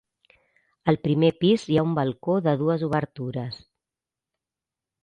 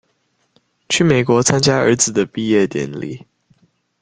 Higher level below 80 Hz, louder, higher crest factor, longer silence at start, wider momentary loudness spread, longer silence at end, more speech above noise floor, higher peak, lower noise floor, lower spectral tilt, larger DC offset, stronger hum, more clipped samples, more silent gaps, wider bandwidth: second, -60 dBFS vs -52 dBFS; second, -24 LUFS vs -15 LUFS; about the same, 20 dB vs 18 dB; about the same, 0.85 s vs 0.9 s; about the same, 11 LU vs 13 LU; first, 1.45 s vs 0.85 s; first, 66 dB vs 49 dB; second, -6 dBFS vs 0 dBFS; first, -89 dBFS vs -65 dBFS; first, -8 dB/octave vs -4 dB/octave; neither; neither; neither; neither; about the same, 9.4 kHz vs 10 kHz